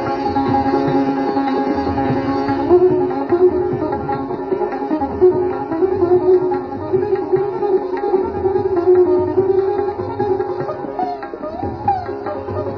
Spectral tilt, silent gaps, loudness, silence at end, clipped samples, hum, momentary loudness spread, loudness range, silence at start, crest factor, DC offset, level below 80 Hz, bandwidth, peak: -9.5 dB/octave; none; -18 LUFS; 0 s; under 0.1%; none; 10 LU; 1 LU; 0 s; 14 dB; under 0.1%; -44 dBFS; 5.4 kHz; -2 dBFS